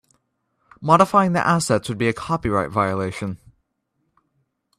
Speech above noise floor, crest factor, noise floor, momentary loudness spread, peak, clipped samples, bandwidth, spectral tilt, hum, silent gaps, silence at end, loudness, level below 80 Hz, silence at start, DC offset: 53 dB; 22 dB; -73 dBFS; 15 LU; 0 dBFS; under 0.1%; 14.5 kHz; -5.5 dB/octave; none; none; 1.45 s; -20 LUFS; -52 dBFS; 0.8 s; under 0.1%